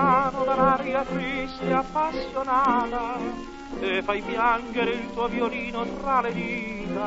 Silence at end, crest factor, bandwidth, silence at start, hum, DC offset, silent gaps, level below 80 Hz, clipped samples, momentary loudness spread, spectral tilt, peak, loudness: 0 s; 18 dB; 8 kHz; 0 s; none; under 0.1%; none; -46 dBFS; under 0.1%; 9 LU; -6 dB/octave; -8 dBFS; -25 LUFS